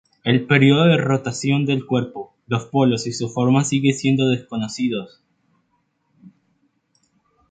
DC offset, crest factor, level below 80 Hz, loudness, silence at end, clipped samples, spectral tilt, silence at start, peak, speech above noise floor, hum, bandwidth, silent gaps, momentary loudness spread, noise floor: under 0.1%; 18 dB; -60 dBFS; -19 LUFS; 1.2 s; under 0.1%; -6 dB/octave; 0.25 s; -2 dBFS; 49 dB; none; 9.2 kHz; none; 11 LU; -68 dBFS